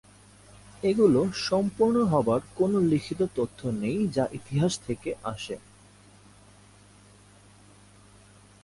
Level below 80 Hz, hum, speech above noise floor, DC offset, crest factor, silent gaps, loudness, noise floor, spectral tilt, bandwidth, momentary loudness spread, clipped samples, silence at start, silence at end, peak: -56 dBFS; 50 Hz at -50 dBFS; 29 dB; under 0.1%; 18 dB; none; -26 LUFS; -54 dBFS; -6.5 dB/octave; 11.5 kHz; 12 LU; under 0.1%; 0.85 s; 3.05 s; -10 dBFS